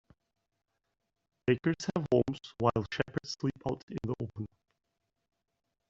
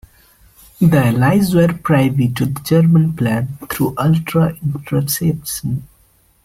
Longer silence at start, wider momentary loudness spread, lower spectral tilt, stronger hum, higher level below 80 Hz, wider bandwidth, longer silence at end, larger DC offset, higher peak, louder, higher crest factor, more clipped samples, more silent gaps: first, 1.45 s vs 0.8 s; about the same, 9 LU vs 9 LU; about the same, -6 dB/octave vs -6.5 dB/octave; neither; second, -62 dBFS vs -44 dBFS; second, 8 kHz vs 16 kHz; first, 1.45 s vs 0.6 s; neither; second, -10 dBFS vs -2 dBFS; second, -33 LUFS vs -16 LUFS; first, 24 dB vs 14 dB; neither; first, 3.83-3.88 s vs none